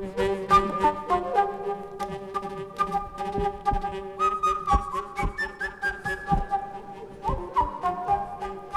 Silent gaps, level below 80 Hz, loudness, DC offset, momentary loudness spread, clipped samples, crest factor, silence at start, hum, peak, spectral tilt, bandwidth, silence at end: none; -38 dBFS; -27 LUFS; under 0.1%; 10 LU; under 0.1%; 20 dB; 0 s; none; -8 dBFS; -5.5 dB/octave; 14.5 kHz; 0 s